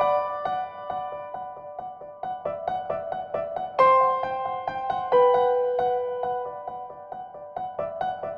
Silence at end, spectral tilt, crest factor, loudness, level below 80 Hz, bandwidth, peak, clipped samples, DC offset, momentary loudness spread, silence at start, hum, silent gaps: 0 s; -6.5 dB/octave; 20 dB; -26 LUFS; -62 dBFS; 5.8 kHz; -6 dBFS; under 0.1%; under 0.1%; 18 LU; 0 s; none; none